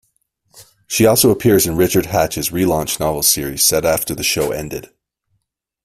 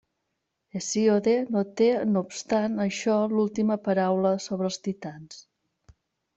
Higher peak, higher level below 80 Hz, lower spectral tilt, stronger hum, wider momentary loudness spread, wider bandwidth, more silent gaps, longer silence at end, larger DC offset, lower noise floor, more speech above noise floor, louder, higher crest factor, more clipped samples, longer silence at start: first, 0 dBFS vs -10 dBFS; first, -42 dBFS vs -68 dBFS; second, -3.5 dB/octave vs -5.5 dB/octave; neither; second, 9 LU vs 12 LU; first, 16 kHz vs 8.2 kHz; neither; about the same, 1 s vs 0.95 s; neither; second, -71 dBFS vs -80 dBFS; about the same, 55 dB vs 55 dB; first, -15 LUFS vs -25 LUFS; about the same, 18 dB vs 16 dB; neither; second, 0.55 s vs 0.75 s